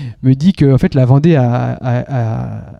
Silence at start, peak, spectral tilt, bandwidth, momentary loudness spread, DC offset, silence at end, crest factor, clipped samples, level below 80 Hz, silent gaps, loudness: 0 s; 0 dBFS; -9 dB/octave; 6.6 kHz; 8 LU; under 0.1%; 0.05 s; 12 dB; under 0.1%; -36 dBFS; none; -13 LUFS